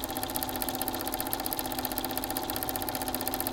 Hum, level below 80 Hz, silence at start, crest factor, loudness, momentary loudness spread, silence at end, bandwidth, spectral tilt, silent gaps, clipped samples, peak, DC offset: none; -50 dBFS; 0 s; 26 dB; -31 LUFS; 1 LU; 0 s; 17.5 kHz; -2.5 dB/octave; none; under 0.1%; -8 dBFS; under 0.1%